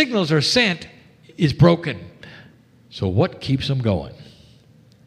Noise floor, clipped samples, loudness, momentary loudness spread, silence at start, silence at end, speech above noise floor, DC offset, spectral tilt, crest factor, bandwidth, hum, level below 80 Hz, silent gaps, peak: -51 dBFS; under 0.1%; -19 LUFS; 21 LU; 0 s; 0.85 s; 32 dB; under 0.1%; -5.5 dB/octave; 20 dB; 12.5 kHz; none; -50 dBFS; none; -2 dBFS